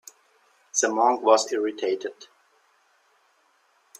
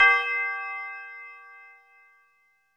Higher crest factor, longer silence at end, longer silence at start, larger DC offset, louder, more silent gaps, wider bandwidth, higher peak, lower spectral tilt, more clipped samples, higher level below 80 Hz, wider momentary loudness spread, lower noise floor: about the same, 22 dB vs 22 dB; first, 1.75 s vs 1.15 s; first, 0.75 s vs 0 s; neither; first, -23 LUFS vs -26 LUFS; neither; first, 15 kHz vs 11.5 kHz; about the same, -4 dBFS vs -6 dBFS; first, -1 dB/octave vs 1 dB/octave; neither; second, -80 dBFS vs -72 dBFS; second, 9 LU vs 25 LU; about the same, -65 dBFS vs -67 dBFS